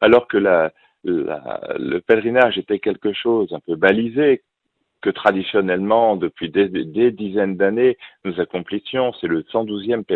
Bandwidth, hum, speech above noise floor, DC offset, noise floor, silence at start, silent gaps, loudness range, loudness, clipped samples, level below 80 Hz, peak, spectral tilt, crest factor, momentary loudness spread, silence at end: 4.4 kHz; none; 55 dB; under 0.1%; -73 dBFS; 0 s; none; 2 LU; -19 LUFS; under 0.1%; -58 dBFS; 0 dBFS; -8 dB/octave; 18 dB; 9 LU; 0 s